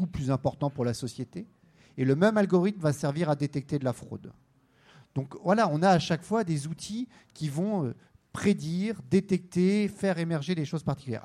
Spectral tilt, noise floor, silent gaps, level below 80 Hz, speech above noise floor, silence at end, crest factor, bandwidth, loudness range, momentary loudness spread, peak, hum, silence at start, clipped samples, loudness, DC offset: -6.5 dB/octave; -61 dBFS; none; -60 dBFS; 33 dB; 0.05 s; 20 dB; 13 kHz; 2 LU; 14 LU; -8 dBFS; none; 0 s; under 0.1%; -28 LUFS; under 0.1%